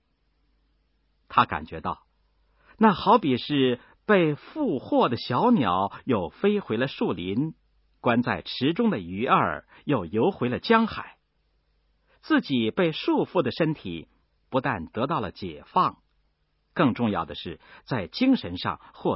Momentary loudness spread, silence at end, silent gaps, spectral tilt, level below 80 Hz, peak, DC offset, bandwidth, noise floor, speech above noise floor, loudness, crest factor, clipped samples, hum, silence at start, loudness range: 12 LU; 0 s; none; -10.5 dB/octave; -56 dBFS; -4 dBFS; under 0.1%; 5.8 kHz; -71 dBFS; 46 dB; -25 LUFS; 22 dB; under 0.1%; none; 1.3 s; 4 LU